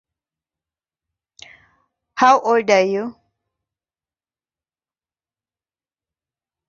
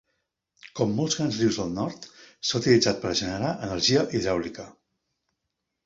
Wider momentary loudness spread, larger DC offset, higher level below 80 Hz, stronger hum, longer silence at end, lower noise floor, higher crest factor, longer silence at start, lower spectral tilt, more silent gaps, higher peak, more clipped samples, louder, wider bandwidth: about the same, 17 LU vs 19 LU; neither; second, -70 dBFS vs -54 dBFS; neither; first, 3.55 s vs 1.15 s; first, under -90 dBFS vs -82 dBFS; about the same, 22 dB vs 20 dB; first, 2.15 s vs 0.65 s; about the same, -4 dB/octave vs -4.5 dB/octave; neither; first, -2 dBFS vs -6 dBFS; neither; first, -16 LUFS vs -25 LUFS; about the same, 7.6 kHz vs 7.8 kHz